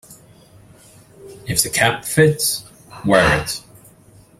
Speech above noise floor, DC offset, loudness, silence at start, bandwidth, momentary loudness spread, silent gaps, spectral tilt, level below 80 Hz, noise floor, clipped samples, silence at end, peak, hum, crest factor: 31 dB; under 0.1%; -17 LUFS; 0.1 s; 16 kHz; 13 LU; none; -3.5 dB/octave; -44 dBFS; -48 dBFS; under 0.1%; 0.8 s; 0 dBFS; none; 20 dB